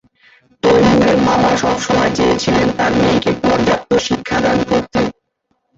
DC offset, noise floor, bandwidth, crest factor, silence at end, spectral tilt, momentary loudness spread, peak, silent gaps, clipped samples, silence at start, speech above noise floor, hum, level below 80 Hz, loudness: under 0.1%; -67 dBFS; 8 kHz; 12 dB; 0.65 s; -5 dB/octave; 6 LU; -2 dBFS; none; under 0.1%; 0.65 s; 53 dB; none; -38 dBFS; -14 LUFS